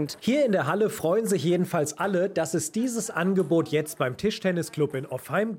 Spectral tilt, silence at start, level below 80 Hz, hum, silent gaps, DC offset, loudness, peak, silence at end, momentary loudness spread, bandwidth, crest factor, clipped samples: -5.5 dB/octave; 0 s; -66 dBFS; none; none; under 0.1%; -26 LUFS; -12 dBFS; 0 s; 5 LU; 17 kHz; 14 dB; under 0.1%